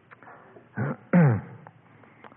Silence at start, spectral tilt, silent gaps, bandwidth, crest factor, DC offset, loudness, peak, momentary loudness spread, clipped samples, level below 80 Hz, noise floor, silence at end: 0.75 s; -13.5 dB/octave; none; 3.3 kHz; 18 dB; under 0.1%; -24 LUFS; -10 dBFS; 20 LU; under 0.1%; -68 dBFS; -54 dBFS; 0.8 s